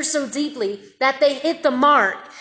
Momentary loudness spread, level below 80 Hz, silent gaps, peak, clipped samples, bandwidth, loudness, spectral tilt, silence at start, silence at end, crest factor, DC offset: 10 LU; -72 dBFS; none; -4 dBFS; under 0.1%; 8 kHz; -19 LUFS; -2 dB/octave; 0 s; 0 s; 16 dB; under 0.1%